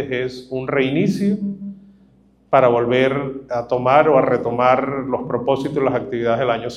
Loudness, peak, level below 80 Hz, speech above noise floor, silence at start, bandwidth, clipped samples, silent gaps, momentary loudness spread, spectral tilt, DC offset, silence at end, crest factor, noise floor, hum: -18 LUFS; 0 dBFS; -52 dBFS; 35 dB; 0 s; 11.5 kHz; under 0.1%; none; 11 LU; -7.5 dB/octave; under 0.1%; 0 s; 18 dB; -53 dBFS; none